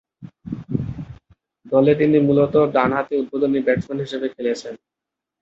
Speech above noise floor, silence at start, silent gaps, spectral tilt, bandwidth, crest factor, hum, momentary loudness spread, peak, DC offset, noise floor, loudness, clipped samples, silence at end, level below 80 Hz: 35 dB; 0.2 s; none; -8 dB/octave; 7.8 kHz; 18 dB; none; 18 LU; -2 dBFS; under 0.1%; -53 dBFS; -19 LUFS; under 0.1%; 0.65 s; -50 dBFS